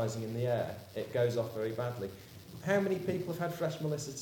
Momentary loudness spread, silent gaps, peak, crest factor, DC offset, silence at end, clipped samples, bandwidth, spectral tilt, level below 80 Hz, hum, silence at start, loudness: 10 LU; none; -16 dBFS; 18 dB; under 0.1%; 0 s; under 0.1%; over 20 kHz; -6 dB/octave; -68 dBFS; none; 0 s; -35 LUFS